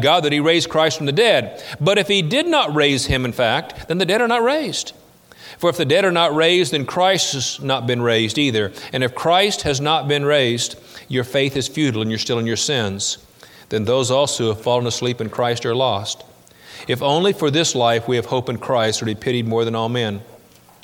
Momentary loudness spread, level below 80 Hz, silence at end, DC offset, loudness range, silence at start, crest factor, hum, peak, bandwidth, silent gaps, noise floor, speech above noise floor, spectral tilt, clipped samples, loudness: 8 LU; -48 dBFS; 0.6 s; under 0.1%; 3 LU; 0 s; 16 dB; none; -2 dBFS; 18.5 kHz; none; -47 dBFS; 29 dB; -4 dB/octave; under 0.1%; -18 LUFS